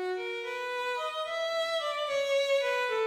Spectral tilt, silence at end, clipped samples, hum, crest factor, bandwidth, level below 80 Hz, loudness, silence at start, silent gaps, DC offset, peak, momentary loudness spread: -0.5 dB/octave; 0 s; under 0.1%; none; 12 dB; 17 kHz; -76 dBFS; -31 LUFS; 0 s; none; under 0.1%; -18 dBFS; 7 LU